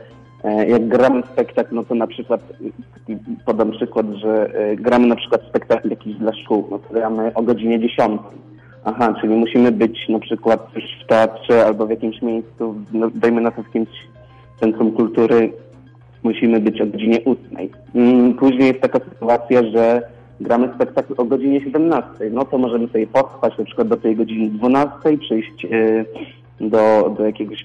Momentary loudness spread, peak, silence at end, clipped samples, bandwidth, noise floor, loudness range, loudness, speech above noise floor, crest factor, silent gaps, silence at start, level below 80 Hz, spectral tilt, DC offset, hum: 10 LU; -4 dBFS; 0 s; under 0.1%; 7.6 kHz; -44 dBFS; 4 LU; -17 LUFS; 27 dB; 12 dB; none; 0.45 s; -56 dBFS; -7.5 dB/octave; under 0.1%; none